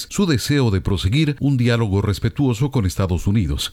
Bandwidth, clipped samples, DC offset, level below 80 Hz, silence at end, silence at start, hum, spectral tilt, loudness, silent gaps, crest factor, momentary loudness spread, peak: 16 kHz; under 0.1%; under 0.1%; -34 dBFS; 0 s; 0 s; none; -6 dB/octave; -19 LUFS; none; 14 dB; 3 LU; -6 dBFS